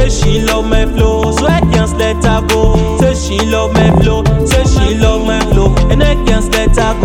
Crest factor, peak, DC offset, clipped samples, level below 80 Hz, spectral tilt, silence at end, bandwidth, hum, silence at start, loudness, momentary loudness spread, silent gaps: 10 dB; 0 dBFS; under 0.1%; under 0.1%; -14 dBFS; -5.5 dB/octave; 0 s; 16.5 kHz; none; 0 s; -11 LUFS; 3 LU; none